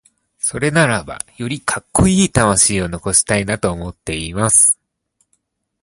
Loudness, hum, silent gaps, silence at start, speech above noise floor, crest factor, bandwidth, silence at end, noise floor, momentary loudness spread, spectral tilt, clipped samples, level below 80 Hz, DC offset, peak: -15 LUFS; none; none; 0.45 s; 51 dB; 18 dB; 12 kHz; 1.1 s; -67 dBFS; 14 LU; -3.5 dB/octave; under 0.1%; -36 dBFS; under 0.1%; 0 dBFS